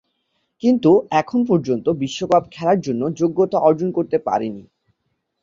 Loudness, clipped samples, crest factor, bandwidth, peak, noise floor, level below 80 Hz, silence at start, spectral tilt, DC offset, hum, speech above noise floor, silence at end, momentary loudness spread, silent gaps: -19 LUFS; under 0.1%; 16 dB; 7.6 kHz; -2 dBFS; -73 dBFS; -58 dBFS; 0.65 s; -7 dB/octave; under 0.1%; none; 55 dB; 0.8 s; 8 LU; none